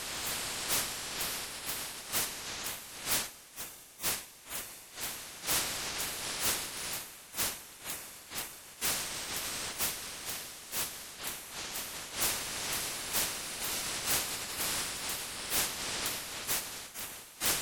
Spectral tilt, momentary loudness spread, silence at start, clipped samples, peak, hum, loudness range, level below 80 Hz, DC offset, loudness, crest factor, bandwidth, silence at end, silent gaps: 0 dB/octave; 9 LU; 0 s; under 0.1%; -16 dBFS; none; 3 LU; -60 dBFS; under 0.1%; -34 LUFS; 20 dB; over 20 kHz; 0 s; none